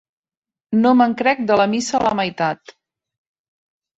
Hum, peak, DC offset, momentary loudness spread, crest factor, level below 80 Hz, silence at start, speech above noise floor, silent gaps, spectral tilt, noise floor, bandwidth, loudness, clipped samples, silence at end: none; -2 dBFS; under 0.1%; 8 LU; 18 dB; -58 dBFS; 0.7 s; over 73 dB; none; -5 dB/octave; under -90 dBFS; 8 kHz; -17 LUFS; under 0.1%; 1.4 s